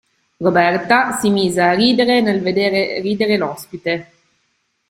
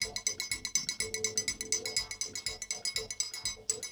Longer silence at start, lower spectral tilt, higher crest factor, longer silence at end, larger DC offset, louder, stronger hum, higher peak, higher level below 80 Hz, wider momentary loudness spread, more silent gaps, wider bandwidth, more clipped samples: first, 0.4 s vs 0 s; first, -5 dB/octave vs 0.5 dB/octave; second, 16 dB vs 24 dB; first, 0.85 s vs 0 s; neither; first, -16 LUFS vs -33 LUFS; neither; first, 0 dBFS vs -12 dBFS; about the same, -56 dBFS vs -60 dBFS; first, 9 LU vs 4 LU; neither; second, 16 kHz vs over 20 kHz; neither